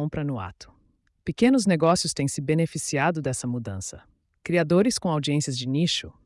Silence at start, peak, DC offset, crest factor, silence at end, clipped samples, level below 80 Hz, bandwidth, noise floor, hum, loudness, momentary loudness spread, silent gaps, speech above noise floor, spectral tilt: 0 s; -10 dBFS; under 0.1%; 16 dB; 0.15 s; under 0.1%; -56 dBFS; 12 kHz; -65 dBFS; none; -24 LUFS; 14 LU; none; 41 dB; -5 dB/octave